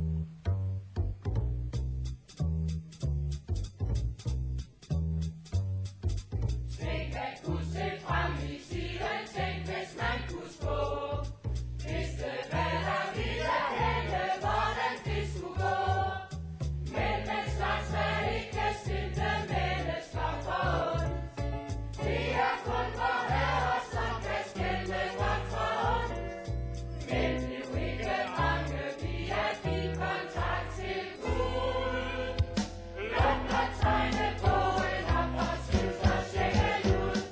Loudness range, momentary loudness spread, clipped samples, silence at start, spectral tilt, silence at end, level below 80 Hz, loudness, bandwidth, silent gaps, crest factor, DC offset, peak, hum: 5 LU; 8 LU; under 0.1%; 0 s; -6 dB/octave; 0 s; -38 dBFS; -33 LUFS; 8 kHz; none; 18 dB; under 0.1%; -14 dBFS; none